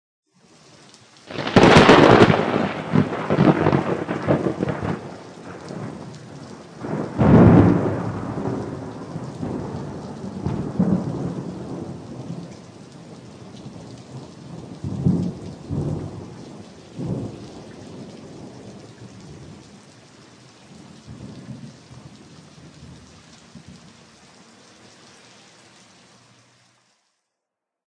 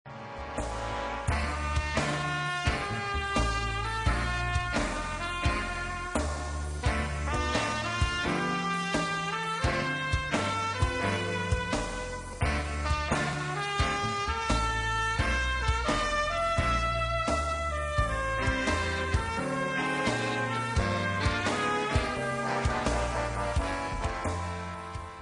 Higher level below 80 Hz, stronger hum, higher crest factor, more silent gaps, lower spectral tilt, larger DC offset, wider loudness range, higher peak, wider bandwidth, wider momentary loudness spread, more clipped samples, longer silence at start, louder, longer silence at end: second, -44 dBFS vs -38 dBFS; neither; about the same, 22 dB vs 18 dB; neither; first, -7 dB/octave vs -4.5 dB/octave; neither; first, 26 LU vs 3 LU; first, -2 dBFS vs -12 dBFS; about the same, 10 kHz vs 10.5 kHz; first, 28 LU vs 5 LU; neither; first, 1.3 s vs 0.05 s; first, -19 LUFS vs -30 LUFS; first, 4.1 s vs 0 s